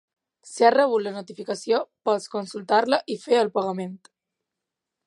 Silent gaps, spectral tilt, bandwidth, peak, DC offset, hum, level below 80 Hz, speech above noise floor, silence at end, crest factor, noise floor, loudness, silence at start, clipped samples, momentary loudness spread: none; -4.5 dB/octave; 11.5 kHz; -4 dBFS; under 0.1%; none; -80 dBFS; 62 dB; 1.1 s; 22 dB; -85 dBFS; -23 LUFS; 0.45 s; under 0.1%; 14 LU